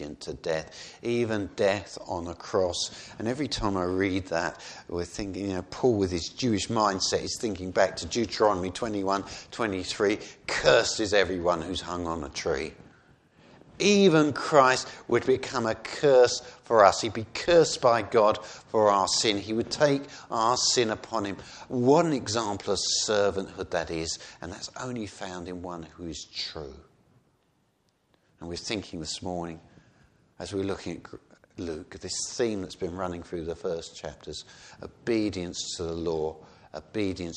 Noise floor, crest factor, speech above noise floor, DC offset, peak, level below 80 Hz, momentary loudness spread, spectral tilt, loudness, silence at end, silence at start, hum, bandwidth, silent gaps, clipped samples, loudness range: -70 dBFS; 24 dB; 43 dB; under 0.1%; -4 dBFS; -54 dBFS; 16 LU; -4 dB/octave; -27 LUFS; 0 s; 0 s; none; 10.5 kHz; none; under 0.1%; 14 LU